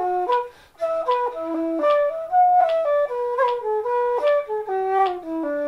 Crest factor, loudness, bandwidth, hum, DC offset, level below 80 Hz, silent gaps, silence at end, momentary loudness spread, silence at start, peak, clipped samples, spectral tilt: 12 dB; -21 LUFS; 11.5 kHz; none; under 0.1%; -62 dBFS; none; 0 s; 8 LU; 0 s; -8 dBFS; under 0.1%; -5 dB/octave